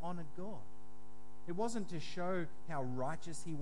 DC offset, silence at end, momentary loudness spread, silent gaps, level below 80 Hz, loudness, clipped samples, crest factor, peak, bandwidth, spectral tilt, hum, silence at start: 2%; 0 s; 21 LU; none; -68 dBFS; -43 LUFS; under 0.1%; 16 dB; -26 dBFS; 11.5 kHz; -5.5 dB/octave; none; 0 s